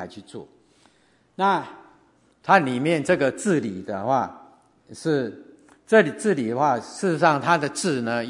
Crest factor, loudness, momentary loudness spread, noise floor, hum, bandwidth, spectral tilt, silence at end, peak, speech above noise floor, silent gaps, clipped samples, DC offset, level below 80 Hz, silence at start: 24 dB; -22 LUFS; 15 LU; -61 dBFS; none; 11 kHz; -5 dB/octave; 0 s; 0 dBFS; 39 dB; none; under 0.1%; under 0.1%; -68 dBFS; 0 s